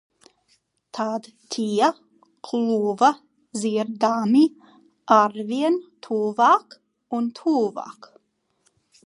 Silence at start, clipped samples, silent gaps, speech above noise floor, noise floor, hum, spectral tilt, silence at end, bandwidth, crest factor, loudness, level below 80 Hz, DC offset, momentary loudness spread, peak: 0.95 s; under 0.1%; none; 48 dB; -70 dBFS; none; -5 dB/octave; 1.15 s; 11.5 kHz; 20 dB; -22 LUFS; -78 dBFS; under 0.1%; 16 LU; -4 dBFS